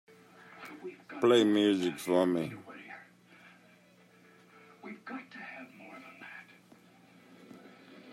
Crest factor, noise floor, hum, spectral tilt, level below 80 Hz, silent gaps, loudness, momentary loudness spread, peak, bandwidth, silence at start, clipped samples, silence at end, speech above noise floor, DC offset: 22 dB; -61 dBFS; none; -5.5 dB/octave; -84 dBFS; none; -29 LUFS; 28 LU; -12 dBFS; 15 kHz; 0.6 s; under 0.1%; 0 s; 34 dB; under 0.1%